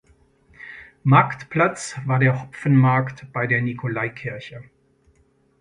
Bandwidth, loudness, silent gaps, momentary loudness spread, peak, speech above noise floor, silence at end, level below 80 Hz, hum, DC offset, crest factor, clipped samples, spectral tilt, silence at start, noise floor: 10.5 kHz; -21 LUFS; none; 22 LU; -2 dBFS; 40 dB; 1 s; -58 dBFS; none; under 0.1%; 20 dB; under 0.1%; -7 dB/octave; 0.6 s; -61 dBFS